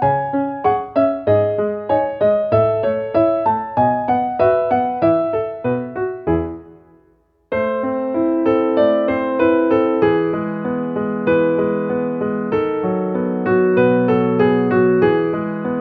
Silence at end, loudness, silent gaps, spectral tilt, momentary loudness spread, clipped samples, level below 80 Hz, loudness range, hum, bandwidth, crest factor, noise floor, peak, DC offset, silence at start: 0 s; -17 LUFS; none; -10.5 dB/octave; 7 LU; under 0.1%; -48 dBFS; 4 LU; none; 5 kHz; 14 dB; -57 dBFS; -2 dBFS; under 0.1%; 0 s